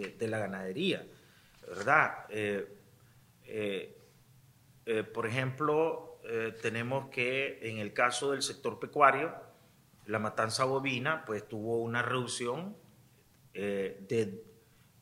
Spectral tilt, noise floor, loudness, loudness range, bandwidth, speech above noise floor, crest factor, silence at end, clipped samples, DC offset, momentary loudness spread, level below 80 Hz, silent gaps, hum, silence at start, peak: -4.5 dB/octave; -63 dBFS; -33 LUFS; 5 LU; 16 kHz; 30 dB; 26 dB; 0.5 s; under 0.1%; under 0.1%; 14 LU; -74 dBFS; none; none; 0 s; -8 dBFS